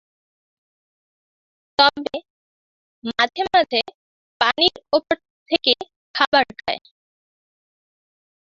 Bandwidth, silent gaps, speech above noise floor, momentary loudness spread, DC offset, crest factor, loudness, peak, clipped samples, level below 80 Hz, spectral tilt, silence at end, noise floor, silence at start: 7.6 kHz; 2.30-3.02 s, 3.94-4.40 s, 5.30-5.46 s, 5.96-6.14 s, 6.27-6.32 s; over 70 dB; 13 LU; under 0.1%; 22 dB; -20 LUFS; 0 dBFS; under 0.1%; -60 dBFS; -3 dB/octave; 1.75 s; under -90 dBFS; 1.8 s